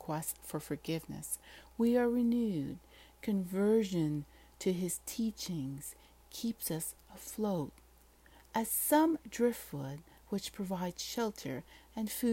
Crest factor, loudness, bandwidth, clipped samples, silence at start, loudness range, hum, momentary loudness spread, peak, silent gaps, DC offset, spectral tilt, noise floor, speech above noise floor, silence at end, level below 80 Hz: 20 dB; -35 LUFS; 16.5 kHz; under 0.1%; 0 s; 5 LU; none; 15 LU; -16 dBFS; none; under 0.1%; -5 dB/octave; -62 dBFS; 27 dB; 0 s; -62 dBFS